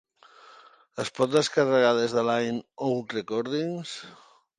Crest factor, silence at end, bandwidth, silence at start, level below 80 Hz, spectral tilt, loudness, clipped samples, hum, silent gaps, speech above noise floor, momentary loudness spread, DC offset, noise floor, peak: 18 dB; 0.45 s; 11.5 kHz; 0.95 s; -72 dBFS; -4.5 dB/octave; -26 LUFS; under 0.1%; none; none; 28 dB; 16 LU; under 0.1%; -54 dBFS; -8 dBFS